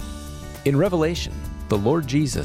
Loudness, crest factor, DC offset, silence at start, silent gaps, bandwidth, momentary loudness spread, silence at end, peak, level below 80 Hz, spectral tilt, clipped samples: -22 LUFS; 16 dB; under 0.1%; 0 s; none; 16.5 kHz; 15 LU; 0 s; -8 dBFS; -36 dBFS; -6 dB/octave; under 0.1%